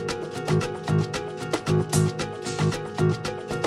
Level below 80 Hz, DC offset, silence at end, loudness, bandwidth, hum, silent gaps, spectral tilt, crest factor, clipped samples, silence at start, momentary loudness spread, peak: -50 dBFS; under 0.1%; 0 s; -26 LUFS; 13 kHz; none; none; -5.5 dB/octave; 16 dB; under 0.1%; 0 s; 7 LU; -8 dBFS